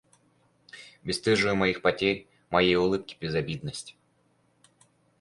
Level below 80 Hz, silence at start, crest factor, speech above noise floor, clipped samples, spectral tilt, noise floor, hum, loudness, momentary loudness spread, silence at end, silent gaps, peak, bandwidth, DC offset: -56 dBFS; 0.75 s; 20 dB; 41 dB; under 0.1%; -5 dB/octave; -68 dBFS; none; -26 LUFS; 17 LU; 1.3 s; none; -8 dBFS; 11.5 kHz; under 0.1%